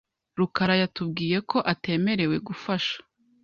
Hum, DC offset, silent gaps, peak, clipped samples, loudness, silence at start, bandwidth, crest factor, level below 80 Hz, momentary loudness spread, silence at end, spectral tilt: none; under 0.1%; none; -6 dBFS; under 0.1%; -26 LUFS; 0.35 s; 7 kHz; 20 dB; -60 dBFS; 7 LU; 0.4 s; -6.5 dB/octave